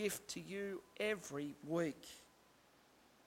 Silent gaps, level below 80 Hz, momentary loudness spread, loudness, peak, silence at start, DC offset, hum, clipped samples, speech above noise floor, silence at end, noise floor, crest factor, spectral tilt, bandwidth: none; -78 dBFS; 13 LU; -44 LUFS; -26 dBFS; 0 s; under 0.1%; none; under 0.1%; 26 dB; 1 s; -69 dBFS; 18 dB; -4 dB/octave; 16.5 kHz